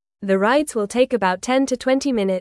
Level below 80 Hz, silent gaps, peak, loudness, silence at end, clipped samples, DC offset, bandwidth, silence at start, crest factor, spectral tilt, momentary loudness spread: -56 dBFS; none; -4 dBFS; -19 LUFS; 0 s; under 0.1%; under 0.1%; 12 kHz; 0.2 s; 14 dB; -4.5 dB/octave; 3 LU